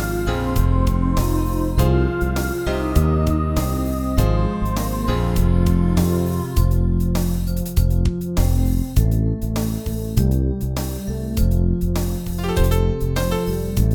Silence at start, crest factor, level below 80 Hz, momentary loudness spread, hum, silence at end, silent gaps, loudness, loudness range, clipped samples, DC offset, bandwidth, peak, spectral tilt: 0 s; 14 dB; -22 dBFS; 5 LU; none; 0 s; none; -20 LUFS; 2 LU; under 0.1%; under 0.1%; 19 kHz; -4 dBFS; -7 dB/octave